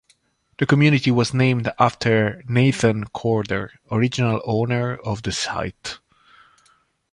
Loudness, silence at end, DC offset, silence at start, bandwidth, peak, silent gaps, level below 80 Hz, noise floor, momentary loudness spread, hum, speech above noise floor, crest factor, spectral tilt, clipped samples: -20 LUFS; 1.15 s; under 0.1%; 0.6 s; 11.5 kHz; -2 dBFS; none; -50 dBFS; -62 dBFS; 10 LU; none; 42 dB; 18 dB; -6 dB/octave; under 0.1%